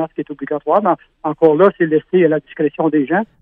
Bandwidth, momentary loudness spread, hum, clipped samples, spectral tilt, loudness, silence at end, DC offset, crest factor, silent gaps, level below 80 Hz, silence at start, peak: 3.8 kHz; 11 LU; none; under 0.1%; -10 dB/octave; -16 LUFS; 0.2 s; under 0.1%; 16 dB; none; -60 dBFS; 0 s; 0 dBFS